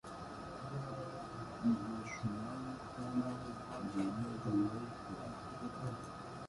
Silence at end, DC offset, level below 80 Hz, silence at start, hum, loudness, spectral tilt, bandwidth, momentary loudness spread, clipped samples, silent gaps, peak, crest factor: 0 s; under 0.1%; -64 dBFS; 0.05 s; none; -42 LUFS; -7 dB/octave; 11.5 kHz; 10 LU; under 0.1%; none; -24 dBFS; 18 dB